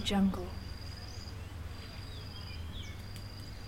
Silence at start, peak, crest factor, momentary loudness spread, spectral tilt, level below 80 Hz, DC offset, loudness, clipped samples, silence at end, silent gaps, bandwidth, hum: 0 s; -20 dBFS; 18 dB; 13 LU; -5.5 dB/octave; -48 dBFS; under 0.1%; -40 LUFS; under 0.1%; 0 s; none; 16 kHz; none